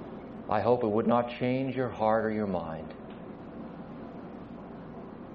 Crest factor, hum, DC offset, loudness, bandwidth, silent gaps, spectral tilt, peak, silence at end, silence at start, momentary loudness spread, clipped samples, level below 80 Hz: 20 dB; none; under 0.1%; -29 LUFS; 6.2 kHz; none; -6 dB/octave; -12 dBFS; 0 s; 0 s; 17 LU; under 0.1%; -60 dBFS